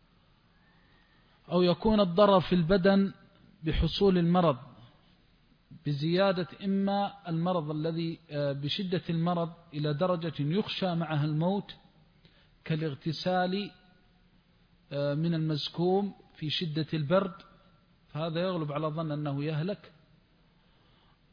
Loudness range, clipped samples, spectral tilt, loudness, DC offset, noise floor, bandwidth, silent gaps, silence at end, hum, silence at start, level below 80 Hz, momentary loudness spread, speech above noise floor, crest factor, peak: 8 LU; under 0.1%; -8.5 dB/octave; -30 LUFS; under 0.1%; -64 dBFS; 5.2 kHz; none; 1.45 s; none; 1.5 s; -50 dBFS; 12 LU; 36 dB; 20 dB; -10 dBFS